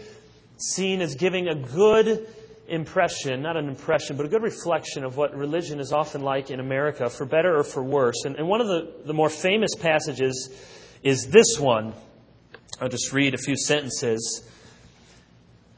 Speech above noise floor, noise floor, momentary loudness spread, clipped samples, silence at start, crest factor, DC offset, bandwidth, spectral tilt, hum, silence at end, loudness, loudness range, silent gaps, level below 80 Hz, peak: 31 dB; -54 dBFS; 11 LU; under 0.1%; 0 s; 24 dB; under 0.1%; 8 kHz; -4 dB/octave; none; 0.9 s; -24 LUFS; 4 LU; none; -60 dBFS; 0 dBFS